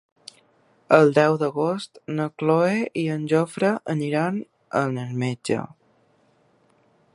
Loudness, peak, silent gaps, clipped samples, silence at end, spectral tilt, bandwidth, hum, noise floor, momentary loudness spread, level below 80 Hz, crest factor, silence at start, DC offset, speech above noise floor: -23 LUFS; 0 dBFS; none; under 0.1%; 1.5 s; -7 dB/octave; 11.5 kHz; none; -62 dBFS; 11 LU; -70 dBFS; 22 dB; 0.9 s; under 0.1%; 40 dB